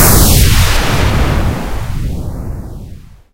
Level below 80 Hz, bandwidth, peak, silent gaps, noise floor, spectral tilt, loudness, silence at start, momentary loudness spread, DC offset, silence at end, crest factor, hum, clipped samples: -16 dBFS; over 20 kHz; 0 dBFS; none; -32 dBFS; -4 dB/octave; -12 LUFS; 0 s; 19 LU; under 0.1%; 0.25 s; 12 dB; none; 0.5%